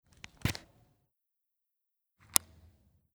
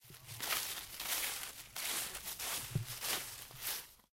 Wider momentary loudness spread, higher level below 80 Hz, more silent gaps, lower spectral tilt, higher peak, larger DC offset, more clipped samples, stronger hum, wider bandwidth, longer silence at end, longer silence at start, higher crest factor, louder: first, 17 LU vs 7 LU; first, -56 dBFS vs -64 dBFS; neither; about the same, -2 dB/octave vs -1 dB/octave; first, 0 dBFS vs -18 dBFS; neither; neither; neither; first, over 20 kHz vs 17 kHz; first, 2.6 s vs 0.1 s; first, 0.45 s vs 0 s; first, 40 dB vs 24 dB; first, -32 LUFS vs -39 LUFS